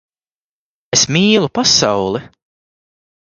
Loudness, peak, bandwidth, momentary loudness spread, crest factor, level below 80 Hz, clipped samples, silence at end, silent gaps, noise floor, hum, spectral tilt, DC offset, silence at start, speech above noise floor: -13 LUFS; 0 dBFS; 10.5 kHz; 9 LU; 18 dB; -50 dBFS; under 0.1%; 1 s; none; under -90 dBFS; none; -3 dB/octave; under 0.1%; 0.95 s; over 76 dB